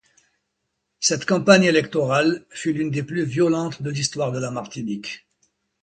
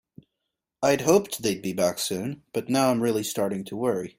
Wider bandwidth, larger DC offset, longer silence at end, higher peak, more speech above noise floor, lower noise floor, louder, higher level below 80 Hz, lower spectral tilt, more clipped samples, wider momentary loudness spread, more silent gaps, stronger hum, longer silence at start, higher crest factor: second, 9.4 kHz vs 16.5 kHz; neither; first, 0.65 s vs 0.1 s; first, -2 dBFS vs -6 dBFS; about the same, 56 dB vs 58 dB; second, -77 dBFS vs -83 dBFS; first, -21 LUFS vs -25 LUFS; about the same, -60 dBFS vs -64 dBFS; about the same, -4.5 dB/octave vs -4.5 dB/octave; neither; first, 14 LU vs 7 LU; neither; neither; first, 1 s vs 0.8 s; about the same, 22 dB vs 20 dB